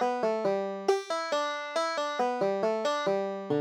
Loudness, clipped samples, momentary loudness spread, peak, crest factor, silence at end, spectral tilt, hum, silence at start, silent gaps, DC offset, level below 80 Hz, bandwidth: -30 LUFS; under 0.1%; 2 LU; -12 dBFS; 18 dB; 0 s; -4.5 dB/octave; none; 0 s; none; under 0.1%; -84 dBFS; 13.5 kHz